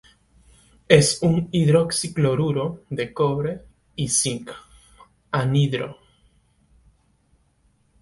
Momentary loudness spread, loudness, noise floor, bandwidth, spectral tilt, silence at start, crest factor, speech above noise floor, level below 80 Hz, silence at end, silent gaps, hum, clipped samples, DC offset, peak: 17 LU; -21 LUFS; -63 dBFS; 11.5 kHz; -5 dB/octave; 0.9 s; 24 dB; 42 dB; -52 dBFS; 2.1 s; none; none; under 0.1%; under 0.1%; 0 dBFS